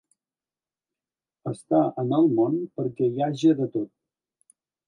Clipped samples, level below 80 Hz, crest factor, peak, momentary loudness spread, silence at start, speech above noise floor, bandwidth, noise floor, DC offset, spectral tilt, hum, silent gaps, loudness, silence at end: under 0.1%; -76 dBFS; 18 dB; -8 dBFS; 14 LU; 1.45 s; over 67 dB; 10.5 kHz; under -90 dBFS; under 0.1%; -8.5 dB/octave; none; none; -24 LUFS; 1 s